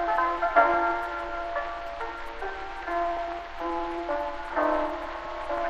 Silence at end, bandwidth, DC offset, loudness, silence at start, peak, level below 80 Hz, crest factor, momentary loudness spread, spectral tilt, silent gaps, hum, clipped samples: 0 s; 8.6 kHz; under 0.1%; -29 LUFS; 0 s; -8 dBFS; -46 dBFS; 20 dB; 12 LU; -5 dB/octave; none; none; under 0.1%